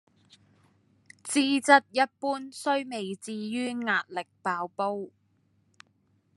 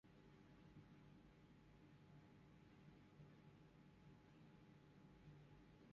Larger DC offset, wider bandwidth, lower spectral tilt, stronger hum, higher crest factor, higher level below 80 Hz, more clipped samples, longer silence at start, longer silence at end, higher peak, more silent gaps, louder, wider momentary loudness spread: neither; first, 12.5 kHz vs 6.8 kHz; second, -3 dB/octave vs -6.5 dB/octave; neither; first, 26 dB vs 14 dB; second, -88 dBFS vs -78 dBFS; neither; first, 1.25 s vs 0.05 s; first, 1.25 s vs 0 s; first, -4 dBFS vs -52 dBFS; neither; first, -28 LUFS vs -68 LUFS; first, 15 LU vs 3 LU